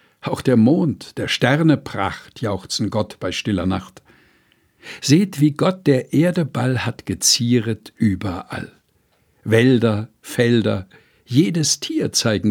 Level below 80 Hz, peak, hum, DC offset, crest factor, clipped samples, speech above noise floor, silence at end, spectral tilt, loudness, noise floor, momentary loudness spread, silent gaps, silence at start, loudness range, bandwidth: -52 dBFS; 0 dBFS; none; under 0.1%; 18 dB; under 0.1%; 44 dB; 0 s; -5 dB/octave; -19 LUFS; -62 dBFS; 12 LU; none; 0.25 s; 4 LU; 18.5 kHz